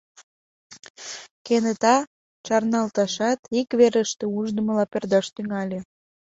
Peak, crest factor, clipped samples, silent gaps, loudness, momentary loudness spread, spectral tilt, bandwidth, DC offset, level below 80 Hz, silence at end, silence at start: -4 dBFS; 20 dB; under 0.1%; 0.23-0.70 s, 0.90-0.94 s, 1.31-1.45 s, 2.07-2.44 s, 3.39-3.43 s; -23 LUFS; 17 LU; -4.5 dB/octave; 8 kHz; under 0.1%; -66 dBFS; 0.45 s; 0.2 s